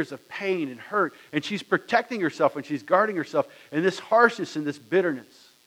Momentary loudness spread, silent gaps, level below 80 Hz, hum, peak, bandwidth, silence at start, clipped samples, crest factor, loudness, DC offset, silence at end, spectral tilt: 10 LU; none; -78 dBFS; none; -4 dBFS; 16 kHz; 0 s; under 0.1%; 22 dB; -25 LUFS; under 0.1%; 0.45 s; -5.5 dB/octave